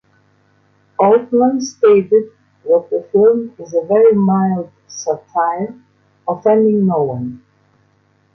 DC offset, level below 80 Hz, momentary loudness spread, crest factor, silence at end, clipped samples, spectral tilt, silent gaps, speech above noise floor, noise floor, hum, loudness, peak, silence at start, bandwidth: under 0.1%; -60 dBFS; 15 LU; 14 dB; 1 s; under 0.1%; -7 dB/octave; none; 43 dB; -57 dBFS; 50 Hz at -40 dBFS; -15 LUFS; 0 dBFS; 1 s; 6.6 kHz